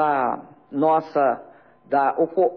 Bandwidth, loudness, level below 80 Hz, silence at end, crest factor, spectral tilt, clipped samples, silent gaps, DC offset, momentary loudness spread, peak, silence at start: 5.4 kHz; -22 LUFS; -70 dBFS; 0 s; 14 dB; -9 dB/octave; under 0.1%; none; under 0.1%; 12 LU; -8 dBFS; 0 s